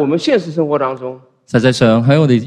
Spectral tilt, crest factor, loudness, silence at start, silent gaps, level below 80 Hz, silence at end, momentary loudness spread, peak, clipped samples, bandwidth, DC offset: -7 dB/octave; 14 dB; -14 LUFS; 0 s; none; -50 dBFS; 0 s; 10 LU; 0 dBFS; under 0.1%; 11 kHz; under 0.1%